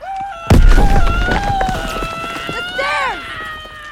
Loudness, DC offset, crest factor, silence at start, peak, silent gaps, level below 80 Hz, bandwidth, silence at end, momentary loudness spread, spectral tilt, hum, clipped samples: -17 LUFS; under 0.1%; 14 dB; 0 s; 0 dBFS; none; -16 dBFS; 14 kHz; 0 s; 12 LU; -5.5 dB/octave; none; under 0.1%